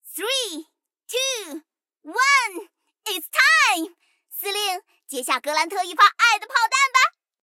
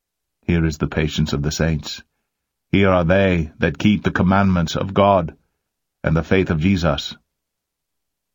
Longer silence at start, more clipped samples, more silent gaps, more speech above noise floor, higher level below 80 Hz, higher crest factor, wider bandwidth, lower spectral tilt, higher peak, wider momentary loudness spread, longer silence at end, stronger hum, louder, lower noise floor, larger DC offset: second, 0.05 s vs 0.5 s; neither; neither; second, 31 dB vs 62 dB; second, under -90 dBFS vs -36 dBFS; about the same, 18 dB vs 20 dB; about the same, 17 kHz vs 17 kHz; second, 3 dB/octave vs -6.5 dB/octave; second, -4 dBFS vs 0 dBFS; first, 19 LU vs 10 LU; second, 0.4 s vs 1.2 s; neither; about the same, -20 LUFS vs -18 LUFS; second, -51 dBFS vs -80 dBFS; neither